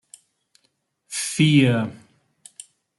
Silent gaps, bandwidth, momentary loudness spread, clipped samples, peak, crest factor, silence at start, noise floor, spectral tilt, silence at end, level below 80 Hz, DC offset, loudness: none; 12 kHz; 26 LU; under 0.1%; -6 dBFS; 18 dB; 1.1 s; -70 dBFS; -5 dB/octave; 1.05 s; -64 dBFS; under 0.1%; -20 LUFS